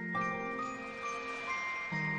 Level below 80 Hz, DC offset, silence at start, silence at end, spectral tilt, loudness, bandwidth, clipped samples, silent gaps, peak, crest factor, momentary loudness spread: -68 dBFS; under 0.1%; 0 s; 0 s; -5 dB/octave; -37 LUFS; 10.5 kHz; under 0.1%; none; -24 dBFS; 14 dB; 4 LU